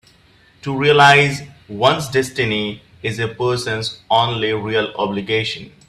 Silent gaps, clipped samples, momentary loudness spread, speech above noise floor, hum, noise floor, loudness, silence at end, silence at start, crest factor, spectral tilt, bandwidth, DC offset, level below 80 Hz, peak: none; under 0.1%; 15 LU; 34 dB; none; -51 dBFS; -17 LUFS; 0.2 s; 0.65 s; 18 dB; -4.5 dB/octave; 14 kHz; under 0.1%; -52 dBFS; 0 dBFS